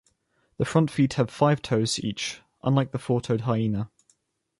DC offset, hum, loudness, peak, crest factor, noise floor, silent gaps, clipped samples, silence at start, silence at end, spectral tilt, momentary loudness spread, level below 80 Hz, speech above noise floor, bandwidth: under 0.1%; none; -25 LUFS; -8 dBFS; 18 dB; -69 dBFS; none; under 0.1%; 0.6 s; 0.75 s; -6 dB/octave; 9 LU; -56 dBFS; 45 dB; 11.5 kHz